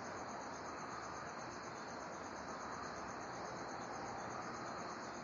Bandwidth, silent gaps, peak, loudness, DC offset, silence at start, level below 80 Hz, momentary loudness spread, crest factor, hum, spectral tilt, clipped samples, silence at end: 11 kHz; none; -34 dBFS; -47 LUFS; under 0.1%; 0 s; -72 dBFS; 2 LU; 14 dB; none; -3.5 dB/octave; under 0.1%; 0 s